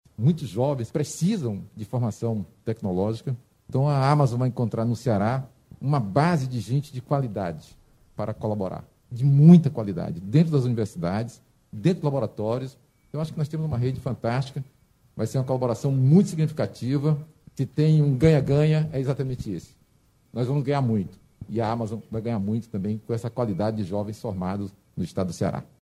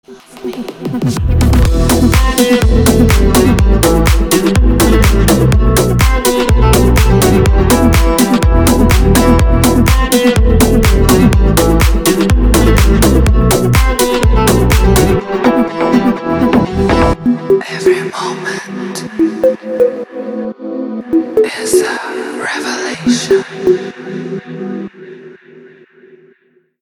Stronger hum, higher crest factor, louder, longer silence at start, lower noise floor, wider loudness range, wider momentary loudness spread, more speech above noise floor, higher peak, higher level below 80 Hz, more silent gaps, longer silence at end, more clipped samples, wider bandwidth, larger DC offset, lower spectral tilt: neither; first, 20 dB vs 10 dB; second, -25 LUFS vs -11 LUFS; about the same, 0.2 s vs 0.1 s; first, -62 dBFS vs -53 dBFS; about the same, 7 LU vs 7 LU; about the same, 13 LU vs 12 LU; about the same, 38 dB vs 41 dB; second, -4 dBFS vs 0 dBFS; second, -54 dBFS vs -14 dBFS; neither; second, 0.2 s vs 1.55 s; neither; second, 12.5 kHz vs over 20 kHz; neither; first, -8 dB/octave vs -5.5 dB/octave